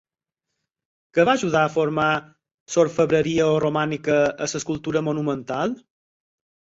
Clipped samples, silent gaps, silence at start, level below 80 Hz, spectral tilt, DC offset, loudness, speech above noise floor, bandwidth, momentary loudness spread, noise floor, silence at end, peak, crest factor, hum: under 0.1%; 2.54-2.66 s; 1.15 s; -58 dBFS; -5 dB/octave; under 0.1%; -22 LUFS; 63 dB; 8 kHz; 7 LU; -84 dBFS; 1 s; -4 dBFS; 18 dB; none